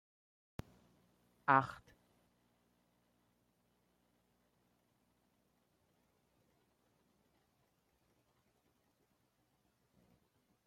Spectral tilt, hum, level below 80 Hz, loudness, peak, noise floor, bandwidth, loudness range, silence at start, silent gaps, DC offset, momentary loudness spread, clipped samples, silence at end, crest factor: -6.5 dB/octave; none; -76 dBFS; -34 LUFS; -14 dBFS; -79 dBFS; 16 kHz; 0 LU; 1.5 s; none; under 0.1%; 22 LU; under 0.1%; 8.9 s; 32 dB